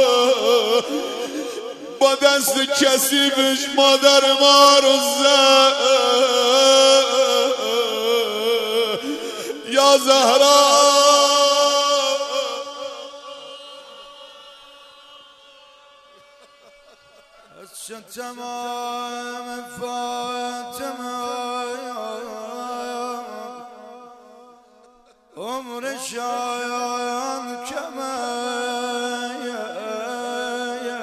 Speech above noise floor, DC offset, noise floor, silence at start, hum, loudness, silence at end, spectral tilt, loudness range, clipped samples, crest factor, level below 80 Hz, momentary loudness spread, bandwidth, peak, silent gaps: 37 dB; under 0.1%; -53 dBFS; 0 s; none; -17 LUFS; 0 s; 0 dB/octave; 19 LU; under 0.1%; 20 dB; -72 dBFS; 19 LU; 14 kHz; 0 dBFS; none